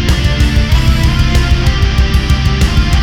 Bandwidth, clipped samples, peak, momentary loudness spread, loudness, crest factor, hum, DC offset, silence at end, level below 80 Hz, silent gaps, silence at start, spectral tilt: 15.5 kHz; under 0.1%; 0 dBFS; 1 LU; -12 LUFS; 10 dB; none; under 0.1%; 0 s; -12 dBFS; none; 0 s; -5.5 dB/octave